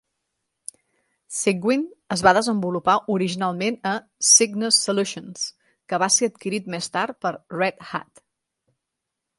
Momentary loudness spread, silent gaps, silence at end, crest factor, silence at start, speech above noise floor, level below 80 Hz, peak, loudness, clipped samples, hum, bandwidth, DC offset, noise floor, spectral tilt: 15 LU; none; 1.35 s; 22 dB; 1.3 s; 60 dB; -62 dBFS; 0 dBFS; -21 LUFS; under 0.1%; none; 11.5 kHz; under 0.1%; -82 dBFS; -2.5 dB/octave